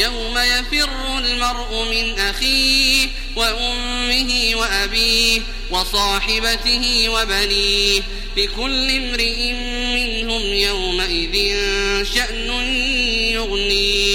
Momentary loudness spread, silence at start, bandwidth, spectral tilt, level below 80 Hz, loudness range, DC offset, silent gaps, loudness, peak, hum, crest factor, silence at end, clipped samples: 6 LU; 0 s; 16.5 kHz; -1.5 dB/octave; -26 dBFS; 3 LU; under 0.1%; none; -17 LUFS; -2 dBFS; none; 16 dB; 0 s; under 0.1%